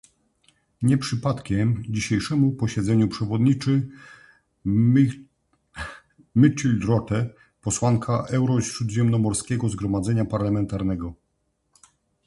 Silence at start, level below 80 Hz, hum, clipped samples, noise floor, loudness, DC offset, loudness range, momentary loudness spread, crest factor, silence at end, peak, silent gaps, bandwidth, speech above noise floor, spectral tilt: 0.8 s; -46 dBFS; none; under 0.1%; -72 dBFS; -23 LUFS; under 0.1%; 2 LU; 13 LU; 20 dB; 1.15 s; -4 dBFS; none; 11.5 kHz; 50 dB; -6.5 dB/octave